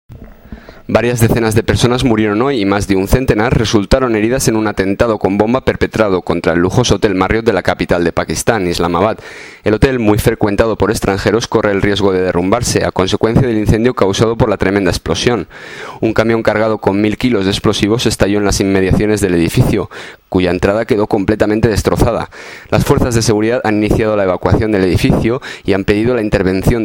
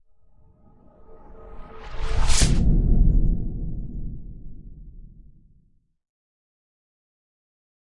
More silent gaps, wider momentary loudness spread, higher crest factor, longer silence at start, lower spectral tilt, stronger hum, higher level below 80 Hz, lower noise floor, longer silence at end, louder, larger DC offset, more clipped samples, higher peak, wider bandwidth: neither; second, 4 LU vs 26 LU; second, 12 dB vs 20 dB; second, 0.1 s vs 1.1 s; about the same, -5.5 dB/octave vs -4.5 dB/octave; neither; about the same, -28 dBFS vs -26 dBFS; second, -34 dBFS vs -60 dBFS; second, 0 s vs 2.95 s; first, -13 LUFS vs -25 LUFS; neither; neither; first, 0 dBFS vs -4 dBFS; first, 17 kHz vs 11.5 kHz